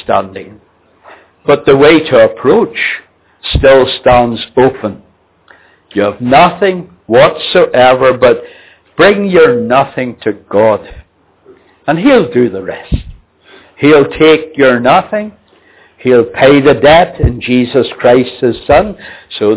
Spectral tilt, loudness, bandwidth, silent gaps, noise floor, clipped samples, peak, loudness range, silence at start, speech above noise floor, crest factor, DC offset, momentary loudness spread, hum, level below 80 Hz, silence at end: -10 dB/octave; -9 LUFS; 4 kHz; none; -45 dBFS; 1%; 0 dBFS; 4 LU; 0.1 s; 37 dB; 10 dB; under 0.1%; 14 LU; none; -30 dBFS; 0 s